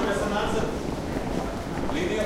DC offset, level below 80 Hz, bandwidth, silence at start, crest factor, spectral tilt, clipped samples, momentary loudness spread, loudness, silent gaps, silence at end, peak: under 0.1%; -38 dBFS; 16 kHz; 0 s; 14 dB; -5.5 dB/octave; under 0.1%; 5 LU; -28 LUFS; none; 0 s; -12 dBFS